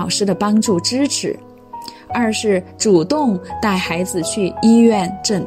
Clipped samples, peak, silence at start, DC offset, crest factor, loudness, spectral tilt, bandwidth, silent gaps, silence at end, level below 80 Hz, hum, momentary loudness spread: under 0.1%; -2 dBFS; 0 s; under 0.1%; 14 dB; -16 LUFS; -4.5 dB/octave; 15.5 kHz; none; 0 s; -52 dBFS; none; 13 LU